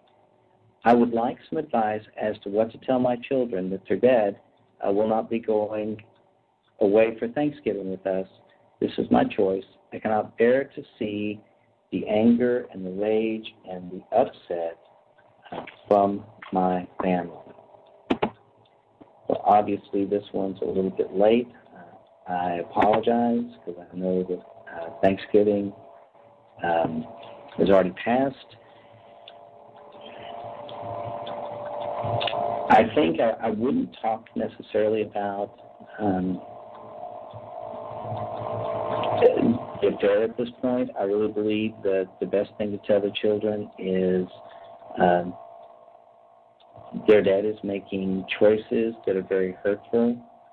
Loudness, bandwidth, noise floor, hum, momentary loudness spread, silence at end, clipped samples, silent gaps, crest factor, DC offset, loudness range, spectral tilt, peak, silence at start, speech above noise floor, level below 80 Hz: -25 LUFS; 5.2 kHz; -65 dBFS; none; 17 LU; 0.3 s; under 0.1%; none; 18 dB; under 0.1%; 5 LU; -9 dB/octave; -6 dBFS; 0.85 s; 41 dB; -60 dBFS